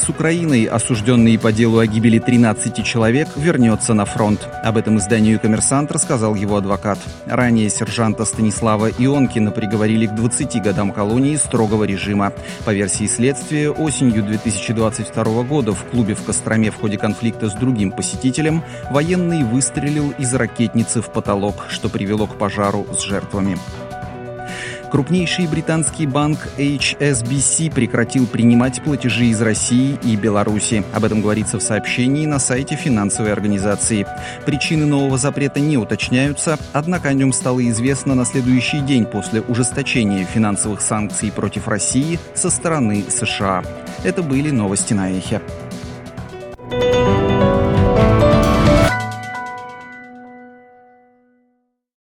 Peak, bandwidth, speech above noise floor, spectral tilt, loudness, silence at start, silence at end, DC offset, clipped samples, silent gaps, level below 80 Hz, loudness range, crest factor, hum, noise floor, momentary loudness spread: 0 dBFS; 13 kHz; 49 dB; -5 dB/octave; -17 LUFS; 0 s; 1.55 s; under 0.1%; under 0.1%; none; -36 dBFS; 5 LU; 16 dB; none; -65 dBFS; 8 LU